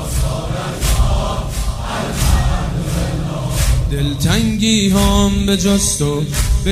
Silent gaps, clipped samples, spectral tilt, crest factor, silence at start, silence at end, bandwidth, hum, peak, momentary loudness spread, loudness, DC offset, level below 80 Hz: none; under 0.1%; -4.5 dB/octave; 14 dB; 0 s; 0 s; 16 kHz; none; 0 dBFS; 8 LU; -16 LUFS; under 0.1%; -20 dBFS